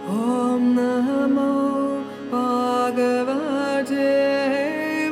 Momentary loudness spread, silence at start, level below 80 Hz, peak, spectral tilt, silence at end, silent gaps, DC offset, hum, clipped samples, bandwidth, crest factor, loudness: 4 LU; 0 s; -70 dBFS; -10 dBFS; -5.5 dB/octave; 0 s; none; under 0.1%; none; under 0.1%; 14.5 kHz; 12 dB; -21 LUFS